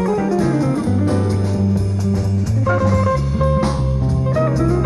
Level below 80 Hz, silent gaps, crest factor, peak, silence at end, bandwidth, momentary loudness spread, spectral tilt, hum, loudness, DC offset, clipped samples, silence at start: -28 dBFS; none; 10 dB; -6 dBFS; 0 s; 11.5 kHz; 2 LU; -8 dB/octave; none; -17 LUFS; under 0.1%; under 0.1%; 0 s